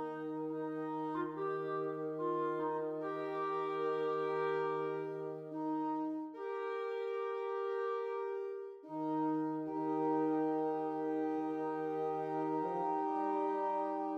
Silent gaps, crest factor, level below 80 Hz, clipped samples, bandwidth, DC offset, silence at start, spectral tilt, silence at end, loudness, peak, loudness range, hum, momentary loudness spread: none; 12 dB; under -90 dBFS; under 0.1%; 6.2 kHz; under 0.1%; 0 s; -8 dB/octave; 0 s; -38 LUFS; -26 dBFS; 3 LU; none; 6 LU